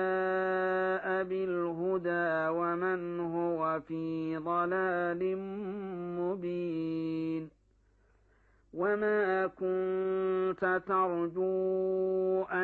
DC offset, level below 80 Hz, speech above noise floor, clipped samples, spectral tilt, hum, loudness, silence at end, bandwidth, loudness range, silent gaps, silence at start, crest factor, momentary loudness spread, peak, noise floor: under 0.1%; -70 dBFS; 37 dB; under 0.1%; -9 dB/octave; none; -32 LUFS; 0 s; 4.5 kHz; 5 LU; none; 0 s; 14 dB; 6 LU; -18 dBFS; -68 dBFS